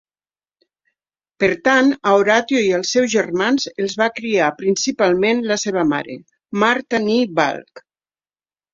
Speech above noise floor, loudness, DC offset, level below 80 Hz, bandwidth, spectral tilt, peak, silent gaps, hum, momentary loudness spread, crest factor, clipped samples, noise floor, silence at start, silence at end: over 73 dB; -17 LUFS; under 0.1%; -60 dBFS; 7.8 kHz; -4 dB/octave; -2 dBFS; none; none; 6 LU; 18 dB; under 0.1%; under -90 dBFS; 1.4 s; 0.95 s